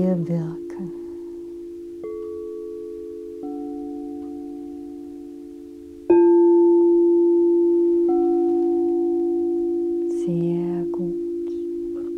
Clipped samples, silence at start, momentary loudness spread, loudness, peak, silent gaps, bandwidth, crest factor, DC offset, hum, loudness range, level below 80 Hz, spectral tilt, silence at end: under 0.1%; 0 s; 20 LU; -20 LUFS; -6 dBFS; none; 2.6 kHz; 16 dB; under 0.1%; none; 16 LU; -58 dBFS; -10.5 dB/octave; 0 s